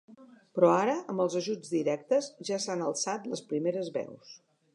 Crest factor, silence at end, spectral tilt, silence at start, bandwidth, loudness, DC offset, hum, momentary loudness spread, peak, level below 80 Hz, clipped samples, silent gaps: 20 dB; 0.4 s; -4.5 dB/octave; 0.1 s; 11 kHz; -30 LUFS; under 0.1%; none; 11 LU; -10 dBFS; -86 dBFS; under 0.1%; none